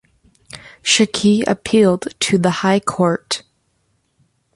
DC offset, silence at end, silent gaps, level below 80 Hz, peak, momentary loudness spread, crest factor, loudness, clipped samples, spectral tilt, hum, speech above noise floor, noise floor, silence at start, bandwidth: under 0.1%; 1.15 s; none; -54 dBFS; -2 dBFS; 10 LU; 16 dB; -16 LUFS; under 0.1%; -4 dB/octave; none; 49 dB; -65 dBFS; 0.55 s; 11.5 kHz